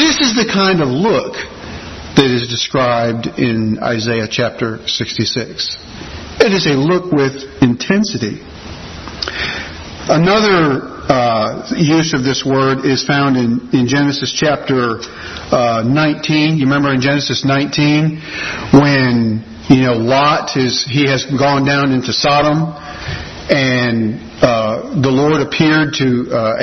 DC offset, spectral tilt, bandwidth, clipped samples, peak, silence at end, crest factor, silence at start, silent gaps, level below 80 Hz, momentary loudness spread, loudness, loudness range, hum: under 0.1%; -5 dB/octave; 6.4 kHz; under 0.1%; 0 dBFS; 0 s; 14 dB; 0 s; none; -42 dBFS; 12 LU; -14 LUFS; 3 LU; none